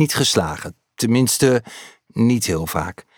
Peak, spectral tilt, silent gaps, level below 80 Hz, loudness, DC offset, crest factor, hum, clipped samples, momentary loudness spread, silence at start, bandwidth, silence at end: -4 dBFS; -4.5 dB/octave; none; -46 dBFS; -18 LUFS; under 0.1%; 16 dB; none; under 0.1%; 17 LU; 0 s; over 20 kHz; 0.25 s